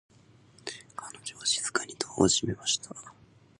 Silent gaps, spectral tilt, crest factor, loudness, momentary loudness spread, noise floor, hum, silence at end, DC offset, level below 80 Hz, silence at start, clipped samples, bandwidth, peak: none; -2.5 dB/octave; 26 dB; -29 LUFS; 18 LU; -58 dBFS; none; 0.5 s; under 0.1%; -58 dBFS; 0.65 s; under 0.1%; 11.5 kHz; -6 dBFS